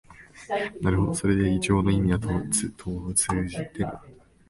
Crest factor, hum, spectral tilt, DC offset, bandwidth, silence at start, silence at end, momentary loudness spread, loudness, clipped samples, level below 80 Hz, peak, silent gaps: 18 dB; none; -5 dB/octave; under 0.1%; 11.5 kHz; 0.1 s; 0.35 s; 10 LU; -25 LUFS; under 0.1%; -40 dBFS; -8 dBFS; none